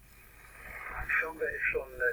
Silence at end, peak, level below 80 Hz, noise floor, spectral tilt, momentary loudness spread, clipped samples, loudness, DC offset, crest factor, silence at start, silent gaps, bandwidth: 0 s; -18 dBFS; -52 dBFS; -55 dBFS; -4.5 dB/octave; 20 LU; under 0.1%; -32 LUFS; under 0.1%; 18 dB; 0 s; none; over 20 kHz